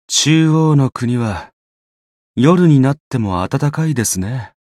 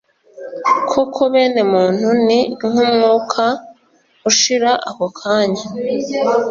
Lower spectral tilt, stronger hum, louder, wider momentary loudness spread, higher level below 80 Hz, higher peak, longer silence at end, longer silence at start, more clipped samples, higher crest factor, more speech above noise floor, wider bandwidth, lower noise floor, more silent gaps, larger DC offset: first, -5.5 dB/octave vs -3 dB/octave; neither; about the same, -14 LUFS vs -15 LUFS; about the same, 10 LU vs 9 LU; first, -48 dBFS vs -60 dBFS; about the same, 0 dBFS vs 0 dBFS; first, 0.25 s vs 0 s; second, 0.1 s vs 0.35 s; neither; about the same, 14 dB vs 16 dB; first, over 76 dB vs 40 dB; first, 14.5 kHz vs 7.6 kHz; first, under -90 dBFS vs -55 dBFS; first, 1.53-2.34 s, 3.00-3.11 s vs none; neither